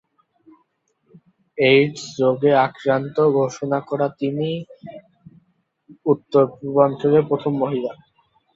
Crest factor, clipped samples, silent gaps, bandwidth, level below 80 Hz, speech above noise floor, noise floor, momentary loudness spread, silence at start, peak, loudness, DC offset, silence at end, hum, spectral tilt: 18 dB; under 0.1%; none; 7.8 kHz; -64 dBFS; 48 dB; -67 dBFS; 12 LU; 1.55 s; -2 dBFS; -19 LUFS; under 0.1%; 0.6 s; none; -6.5 dB/octave